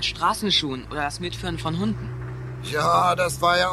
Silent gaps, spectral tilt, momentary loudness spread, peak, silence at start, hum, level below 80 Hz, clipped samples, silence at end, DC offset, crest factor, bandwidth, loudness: none; -4 dB/octave; 13 LU; -6 dBFS; 0 s; none; -44 dBFS; under 0.1%; 0 s; under 0.1%; 16 dB; 15.5 kHz; -23 LUFS